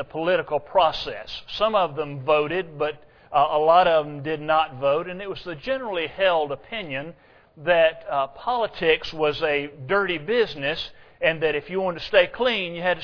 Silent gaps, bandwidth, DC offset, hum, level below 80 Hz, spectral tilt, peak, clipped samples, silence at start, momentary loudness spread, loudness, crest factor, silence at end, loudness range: none; 5.4 kHz; under 0.1%; none; -52 dBFS; -6 dB/octave; -4 dBFS; under 0.1%; 0 s; 12 LU; -23 LUFS; 20 dB; 0 s; 3 LU